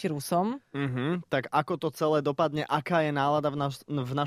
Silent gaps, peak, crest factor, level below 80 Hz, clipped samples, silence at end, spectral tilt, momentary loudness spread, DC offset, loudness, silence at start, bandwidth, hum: none; -10 dBFS; 20 dB; -66 dBFS; under 0.1%; 0 s; -6.5 dB/octave; 6 LU; under 0.1%; -29 LUFS; 0 s; 15.5 kHz; none